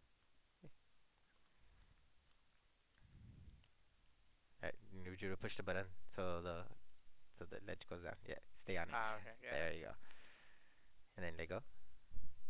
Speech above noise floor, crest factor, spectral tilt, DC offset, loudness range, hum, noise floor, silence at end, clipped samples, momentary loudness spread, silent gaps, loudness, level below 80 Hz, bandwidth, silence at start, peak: 31 dB; 18 dB; -4 dB/octave; under 0.1%; 6 LU; none; -75 dBFS; 0 s; under 0.1%; 21 LU; none; -49 LUFS; -66 dBFS; 4 kHz; 0.1 s; -26 dBFS